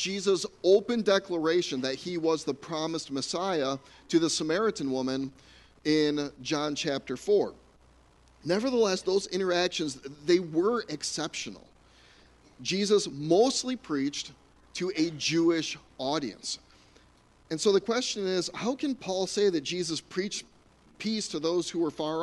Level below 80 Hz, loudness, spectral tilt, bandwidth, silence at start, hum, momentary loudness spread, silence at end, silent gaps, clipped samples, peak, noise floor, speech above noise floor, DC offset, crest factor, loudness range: -64 dBFS; -29 LUFS; -4 dB/octave; 11.5 kHz; 0 s; none; 10 LU; 0 s; none; under 0.1%; -10 dBFS; -60 dBFS; 32 dB; under 0.1%; 18 dB; 3 LU